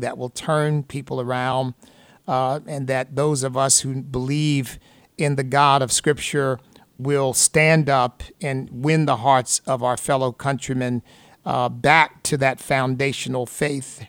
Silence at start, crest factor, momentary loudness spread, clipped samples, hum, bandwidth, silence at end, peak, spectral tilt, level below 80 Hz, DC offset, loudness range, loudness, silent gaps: 0 s; 20 dB; 11 LU; under 0.1%; none; 17.5 kHz; 0 s; -2 dBFS; -4 dB/octave; -52 dBFS; under 0.1%; 3 LU; -21 LUFS; none